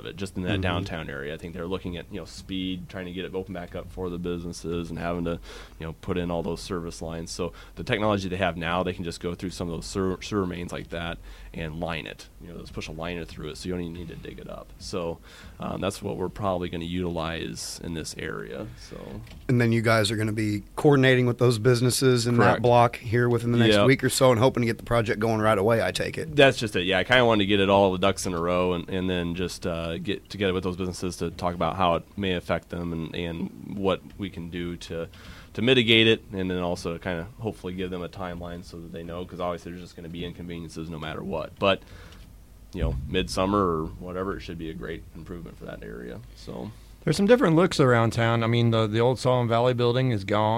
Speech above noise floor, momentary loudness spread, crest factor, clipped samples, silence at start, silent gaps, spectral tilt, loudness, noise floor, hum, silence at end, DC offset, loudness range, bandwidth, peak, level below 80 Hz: 22 dB; 18 LU; 22 dB; under 0.1%; 0.05 s; none; -5.5 dB/octave; -25 LUFS; -48 dBFS; none; 0 s; under 0.1%; 13 LU; 16 kHz; -4 dBFS; -46 dBFS